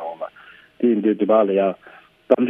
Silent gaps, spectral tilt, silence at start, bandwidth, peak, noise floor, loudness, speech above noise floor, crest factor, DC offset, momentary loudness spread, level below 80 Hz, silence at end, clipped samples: none; -9.5 dB/octave; 0 s; 3.9 kHz; 0 dBFS; -47 dBFS; -19 LUFS; 30 dB; 20 dB; under 0.1%; 18 LU; -70 dBFS; 0 s; under 0.1%